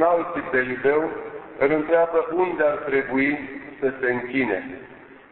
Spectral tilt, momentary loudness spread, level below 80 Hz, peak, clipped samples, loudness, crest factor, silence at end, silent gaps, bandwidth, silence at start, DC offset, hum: -10.5 dB/octave; 11 LU; -58 dBFS; -6 dBFS; under 0.1%; -23 LUFS; 18 dB; 0.15 s; none; 4.2 kHz; 0 s; under 0.1%; none